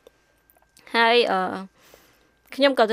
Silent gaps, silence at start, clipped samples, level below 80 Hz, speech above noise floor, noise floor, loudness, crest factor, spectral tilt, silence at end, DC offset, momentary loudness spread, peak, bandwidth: none; 0.95 s; under 0.1%; -70 dBFS; 41 dB; -61 dBFS; -21 LUFS; 20 dB; -4 dB/octave; 0 s; under 0.1%; 20 LU; -4 dBFS; 15.5 kHz